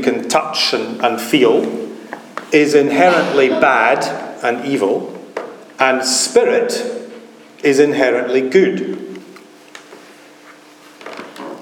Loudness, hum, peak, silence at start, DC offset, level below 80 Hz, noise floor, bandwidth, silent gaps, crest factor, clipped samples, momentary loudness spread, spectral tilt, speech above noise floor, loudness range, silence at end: -15 LUFS; none; 0 dBFS; 0 s; under 0.1%; -68 dBFS; -42 dBFS; 18.5 kHz; none; 16 dB; under 0.1%; 19 LU; -3.5 dB/octave; 28 dB; 4 LU; 0 s